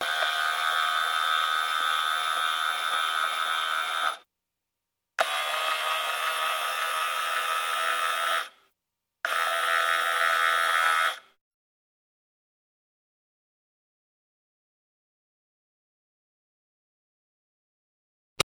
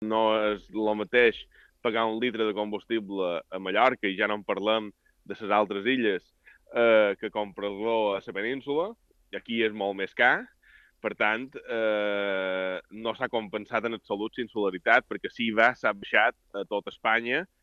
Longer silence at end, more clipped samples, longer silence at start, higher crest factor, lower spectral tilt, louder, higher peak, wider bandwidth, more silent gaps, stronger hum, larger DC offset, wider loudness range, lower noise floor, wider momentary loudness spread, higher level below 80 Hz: second, 0 s vs 0.15 s; neither; about the same, 0 s vs 0 s; about the same, 24 dB vs 22 dB; second, 1 dB/octave vs -6 dB/octave; about the same, -26 LUFS vs -27 LUFS; about the same, -4 dBFS vs -6 dBFS; first, 19.5 kHz vs 7.2 kHz; first, 11.41-18.36 s vs none; neither; neither; about the same, 3 LU vs 3 LU; first, -85 dBFS vs -59 dBFS; second, 6 LU vs 11 LU; second, -80 dBFS vs -66 dBFS